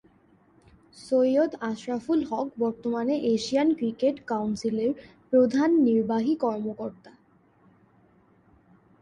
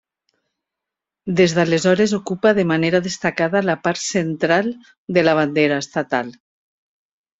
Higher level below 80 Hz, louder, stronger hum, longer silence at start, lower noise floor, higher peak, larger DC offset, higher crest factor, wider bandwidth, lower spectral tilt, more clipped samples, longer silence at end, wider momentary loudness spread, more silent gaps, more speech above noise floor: second, -66 dBFS vs -58 dBFS; second, -26 LUFS vs -18 LUFS; neither; second, 0.95 s vs 1.25 s; second, -61 dBFS vs -85 dBFS; second, -10 dBFS vs -2 dBFS; neither; about the same, 16 dB vs 16 dB; first, 10.5 kHz vs 8.2 kHz; about the same, -6 dB/octave vs -5 dB/octave; neither; first, 1.9 s vs 1.1 s; first, 10 LU vs 7 LU; second, none vs 4.98-5.07 s; second, 36 dB vs 67 dB